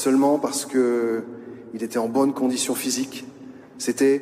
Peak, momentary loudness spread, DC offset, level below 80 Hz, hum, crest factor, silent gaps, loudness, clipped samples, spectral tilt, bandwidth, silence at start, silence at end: -10 dBFS; 18 LU; under 0.1%; -72 dBFS; none; 14 dB; none; -23 LUFS; under 0.1%; -3.5 dB/octave; 16 kHz; 0 s; 0 s